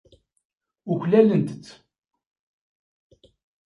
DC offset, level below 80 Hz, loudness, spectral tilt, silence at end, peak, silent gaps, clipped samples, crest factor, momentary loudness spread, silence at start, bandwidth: under 0.1%; -68 dBFS; -21 LUFS; -9 dB/octave; 1.95 s; -4 dBFS; none; under 0.1%; 22 dB; 23 LU; 0.85 s; 10.5 kHz